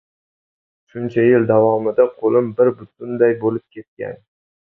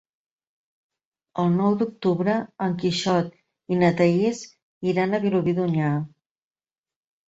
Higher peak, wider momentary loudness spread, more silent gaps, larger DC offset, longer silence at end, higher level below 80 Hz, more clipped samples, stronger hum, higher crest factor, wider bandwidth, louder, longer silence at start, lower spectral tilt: first, -2 dBFS vs -6 dBFS; first, 17 LU vs 10 LU; second, 3.88-3.97 s vs 4.62-4.81 s; neither; second, 0.65 s vs 1.25 s; about the same, -62 dBFS vs -62 dBFS; neither; neither; about the same, 16 dB vs 18 dB; second, 3.8 kHz vs 8 kHz; first, -16 LUFS vs -23 LUFS; second, 0.95 s vs 1.35 s; first, -10.5 dB/octave vs -7 dB/octave